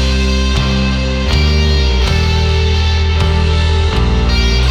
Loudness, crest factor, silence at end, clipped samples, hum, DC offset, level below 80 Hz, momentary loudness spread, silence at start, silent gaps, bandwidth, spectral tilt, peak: -13 LUFS; 10 dB; 0 s; under 0.1%; none; under 0.1%; -14 dBFS; 2 LU; 0 s; none; 9.6 kHz; -5.5 dB/octave; 0 dBFS